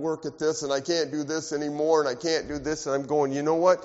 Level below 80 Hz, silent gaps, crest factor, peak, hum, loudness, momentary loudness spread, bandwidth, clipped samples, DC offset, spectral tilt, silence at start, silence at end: -58 dBFS; none; 18 dB; -8 dBFS; none; -26 LUFS; 7 LU; 8 kHz; under 0.1%; under 0.1%; -4 dB/octave; 0 s; 0 s